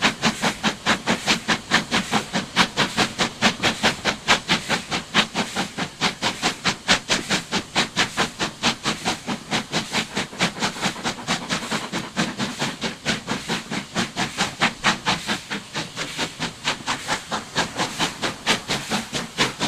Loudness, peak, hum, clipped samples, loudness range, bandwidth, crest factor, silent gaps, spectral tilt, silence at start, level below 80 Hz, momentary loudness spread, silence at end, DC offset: -23 LUFS; -2 dBFS; none; under 0.1%; 5 LU; 15.5 kHz; 22 dB; none; -2.5 dB/octave; 0 s; -52 dBFS; 7 LU; 0 s; under 0.1%